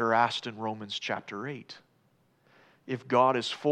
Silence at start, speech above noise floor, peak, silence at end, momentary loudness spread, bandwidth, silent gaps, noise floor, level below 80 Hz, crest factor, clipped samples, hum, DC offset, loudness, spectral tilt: 0 s; 38 dB; -10 dBFS; 0 s; 17 LU; 11 kHz; none; -68 dBFS; -86 dBFS; 20 dB; under 0.1%; none; under 0.1%; -30 LUFS; -4.5 dB/octave